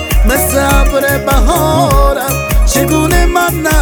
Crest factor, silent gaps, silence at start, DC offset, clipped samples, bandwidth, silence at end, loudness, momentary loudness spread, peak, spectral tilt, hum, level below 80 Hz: 10 dB; none; 0 s; under 0.1%; under 0.1%; over 20 kHz; 0 s; -11 LUFS; 2 LU; 0 dBFS; -4.5 dB/octave; none; -14 dBFS